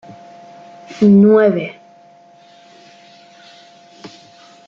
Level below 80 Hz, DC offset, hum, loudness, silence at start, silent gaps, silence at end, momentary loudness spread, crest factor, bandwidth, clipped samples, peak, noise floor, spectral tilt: -62 dBFS; under 0.1%; none; -12 LUFS; 0.9 s; none; 0.6 s; 29 LU; 16 dB; 7 kHz; under 0.1%; -2 dBFS; -46 dBFS; -8.5 dB/octave